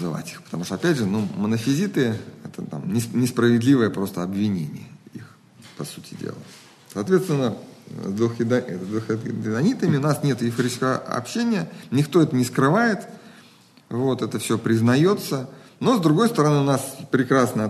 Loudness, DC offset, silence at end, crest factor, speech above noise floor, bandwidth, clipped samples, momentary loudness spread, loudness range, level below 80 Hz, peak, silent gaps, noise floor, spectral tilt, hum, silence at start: -22 LUFS; under 0.1%; 0 s; 16 dB; 30 dB; 13 kHz; under 0.1%; 16 LU; 6 LU; -64 dBFS; -6 dBFS; none; -52 dBFS; -6 dB/octave; none; 0 s